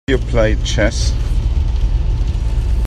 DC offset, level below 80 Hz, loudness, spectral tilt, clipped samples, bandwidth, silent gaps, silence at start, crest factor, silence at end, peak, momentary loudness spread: under 0.1%; -16 dBFS; -18 LUFS; -5.5 dB/octave; under 0.1%; 9.8 kHz; none; 0.1 s; 14 dB; 0 s; -2 dBFS; 4 LU